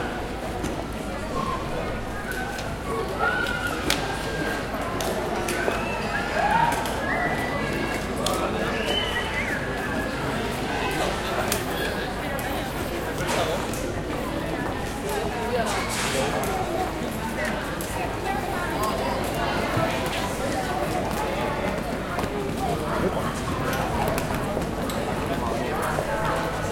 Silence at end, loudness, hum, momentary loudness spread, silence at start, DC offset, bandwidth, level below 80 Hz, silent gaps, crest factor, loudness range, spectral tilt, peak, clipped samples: 0 s; -26 LUFS; none; 5 LU; 0 s; under 0.1%; 17 kHz; -38 dBFS; none; 24 dB; 2 LU; -4.5 dB/octave; -2 dBFS; under 0.1%